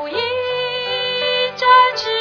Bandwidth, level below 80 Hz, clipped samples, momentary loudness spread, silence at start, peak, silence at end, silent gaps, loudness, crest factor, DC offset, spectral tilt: 5.4 kHz; -62 dBFS; under 0.1%; 9 LU; 0 s; 0 dBFS; 0 s; none; -16 LUFS; 16 dB; under 0.1%; -2.5 dB/octave